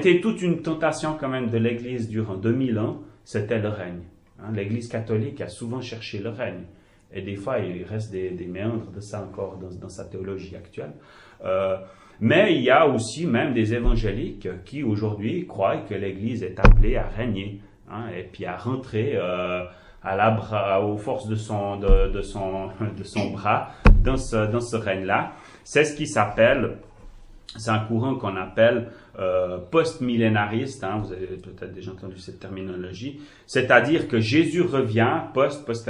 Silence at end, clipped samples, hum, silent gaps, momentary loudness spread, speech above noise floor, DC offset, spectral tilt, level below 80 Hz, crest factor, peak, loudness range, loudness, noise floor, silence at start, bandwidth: 0 s; under 0.1%; none; none; 17 LU; 21 dB; under 0.1%; -6.5 dB/octave; -30 dBFS; 22 dB; -2 dBFS; 9 LU; -24 LUFS; -44 dBFS; 0 s; 11 kHz